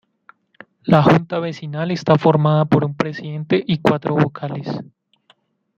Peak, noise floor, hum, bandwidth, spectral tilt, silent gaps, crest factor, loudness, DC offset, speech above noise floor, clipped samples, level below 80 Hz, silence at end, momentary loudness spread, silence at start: -2 dBFS; -59 dBFS; none; 7.2 kHz; -8 dB/octave; none; 18 dB; -18 LUFS; under 0.1%; 41 dB; under 0.1%; -54 dBFS; 0.95 s; 13 LU; 0.85 s